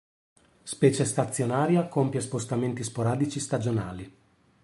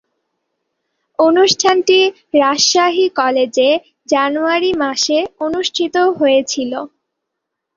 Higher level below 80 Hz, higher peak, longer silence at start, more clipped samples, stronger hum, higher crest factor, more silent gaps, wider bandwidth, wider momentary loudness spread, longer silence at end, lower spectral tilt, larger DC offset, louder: about the same, -58 dBFS vs -58 dBFS; second, -8 dBFS vs 0 dBFS; second, 0.65 s vs 1.2 s; neither; neither; first, 20 dB vs 14 dB; neither; first, 11.5 kHz vs 7.6 kHz; first, 14 LU vs 9 LU; second, 0.55 s vs 0.9 s; first, -6 dB/octave vs -1.5 dB/octave; neither; second, -27 LUFS vs -14 LUFS